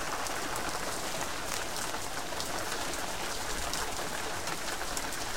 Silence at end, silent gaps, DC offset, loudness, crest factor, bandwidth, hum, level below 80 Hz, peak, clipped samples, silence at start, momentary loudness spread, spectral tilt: 0 s; none; 1%; -34 LUFS; 26 dB; 17 kHz; none; -48 dBFS; -10 dBFS; under 0.1%; 0 s; 1 LU; -1.5 dB/octave